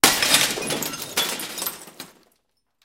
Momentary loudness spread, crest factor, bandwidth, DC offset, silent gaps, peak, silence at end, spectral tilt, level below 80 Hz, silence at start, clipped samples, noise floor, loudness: 23 LU; 24 dB; 17 kHz; under 0.1%; none; 0 dBFS; 0.75 s; -0.5 dB/octave; -56 dBFS; 0.05 s; under 0.1%; -70 dBFS; -21 LUFS